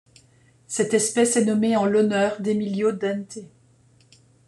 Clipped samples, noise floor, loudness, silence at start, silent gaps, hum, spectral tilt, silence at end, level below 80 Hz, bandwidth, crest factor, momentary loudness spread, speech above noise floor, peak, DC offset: under 0.1%; -57 dBFS; -22 LUFS; 0.7 s; none; none; -4.5 dB/octave; 1.05 s; -66 dBFS; 12.5 kHz; 16 dB; 12 LU; 36 dB; -6 dBFS; under 0.1%